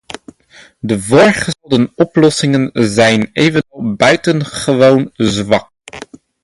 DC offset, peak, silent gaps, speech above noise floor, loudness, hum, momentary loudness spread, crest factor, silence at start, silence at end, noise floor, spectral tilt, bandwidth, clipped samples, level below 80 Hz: under 0.1%; 0 dBFS; none; 28 dB; -12 LUFS; none; 19 LU; 12 dB; 0.85 s; 0.45 s; -39 dBFS; -5 dB/octave; 11.5 kHz; under 0.1%; -46 dBFS